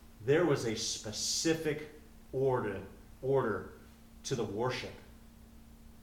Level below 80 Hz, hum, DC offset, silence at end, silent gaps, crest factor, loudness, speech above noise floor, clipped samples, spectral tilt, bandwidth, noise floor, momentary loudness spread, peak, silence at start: -58 dBFS; none; under 0.1%; 0 s; none; 20 dB; -34 LUFS; 22 dB; under 0.1%; -4 dB/octave; 18.5 kHz; -55 dBFS; 16 LU; -16 dBFS; 0 s